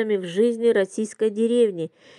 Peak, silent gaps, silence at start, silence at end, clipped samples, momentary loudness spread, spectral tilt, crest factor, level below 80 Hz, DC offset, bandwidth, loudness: -8 dBFS; none; 0 s; 0.3 s; under 0.1%; 5 LU; -5.5 dB/octave; 14 dB; -86 dBFS; under 0.1%; 11 kHz; -22 LUFS